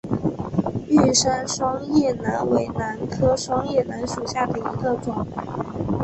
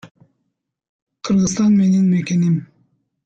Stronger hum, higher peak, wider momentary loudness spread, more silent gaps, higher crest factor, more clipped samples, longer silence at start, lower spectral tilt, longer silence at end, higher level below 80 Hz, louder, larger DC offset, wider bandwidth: neither; first, -4 dBFS vs -8 dBFS; first, 10 LU vs 7 LU; second, none vs 0.11-0.15 s, 0.89-1.07 s; first, 18 dB vs 12 dB; neither; about the same, 0.05 s vs 0.05 s; second, -5 dB/octave vs -6.5 dB/octave; second, 0 s vs 0.6 s; first, -44 dBFS vs -54 dBFS; second, -23 LUFS vs -16 LUFS; neither; about the same, 8.6 kHz vs 8.2 kHz